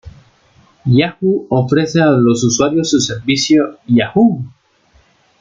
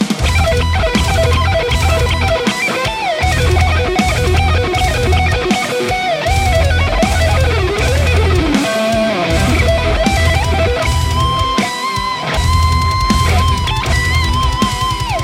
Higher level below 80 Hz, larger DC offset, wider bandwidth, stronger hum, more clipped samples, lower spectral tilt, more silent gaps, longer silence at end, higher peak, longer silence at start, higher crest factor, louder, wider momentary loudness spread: second, -48 dBFS vs -20 dBFS; neither; second, 9.4 kHz vs 16 kHz; neither; neither; about the same, -5 dB/octave vs -5 dB/octave; neither; first, 0.9 s vs 0 s; about the same, -2 dBFS vs 0 dBFS; about the same, 0.05 s vs 0 s; about the same, 14 dB vs 12 dB; about the same, -14 LUFS vs -14 LUFS; about the same, 5 LU vs 3 LU